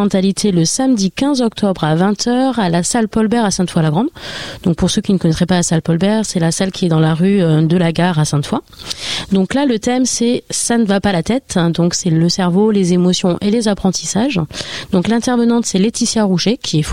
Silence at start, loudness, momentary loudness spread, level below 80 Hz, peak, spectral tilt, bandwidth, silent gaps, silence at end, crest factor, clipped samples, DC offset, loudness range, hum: 0 s; -15 LUFS; 5 LU; -42 dBFS; 0 dBFS; -5 dB/octave; 15 kHz; none; 0 s; 14 dB; under 0.1%; 0.6%; 2 LU; none